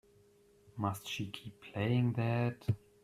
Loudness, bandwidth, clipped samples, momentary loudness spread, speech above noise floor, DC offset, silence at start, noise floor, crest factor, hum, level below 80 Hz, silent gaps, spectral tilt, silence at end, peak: -36 LUFS; 14 kHz; under 0.1%; 13 LU; 31 dB; under 0.1%; 0.75 s; -66 dBFS; 18 dB; none; -66 dBFS; none; -6.5 dB/octave; 0.25 s; -20 dBFS